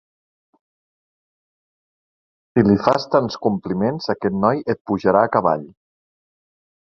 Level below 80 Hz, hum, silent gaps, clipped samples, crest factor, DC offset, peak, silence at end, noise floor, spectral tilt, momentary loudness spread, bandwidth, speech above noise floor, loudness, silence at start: -54 dBFS; none; 4.81-4.85 s; under 0.1%; 20 dB; under 0.1%; -2 dBFS; 1.2 s; under -90 dBFS; -7.5 dB/octave; 7 LU; 7 kHz; over 72 dB; -19 LUFS; 2.55 s